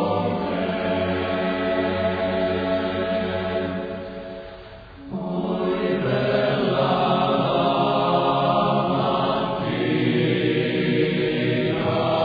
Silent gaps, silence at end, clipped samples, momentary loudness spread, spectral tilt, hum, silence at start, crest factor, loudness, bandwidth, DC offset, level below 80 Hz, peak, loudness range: none; 0 s; under 0.1%; 10 LU; -9 dB/octave; none; 0 s; 16 dB; -22 LUFS; 5 kHz; under 0.1%; -50 dBFS; -6 dBFS; 6 LU